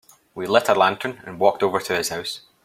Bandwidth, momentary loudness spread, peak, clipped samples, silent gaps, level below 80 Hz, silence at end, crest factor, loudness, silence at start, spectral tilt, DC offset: 16 kHz; 13 LU; -2 dBFS; under 0.1%; none; -64 dBFS; 0.25 s; 20 dB; -21 LUFS; 0.35 s; -3.5 dB/octave; under 0.1%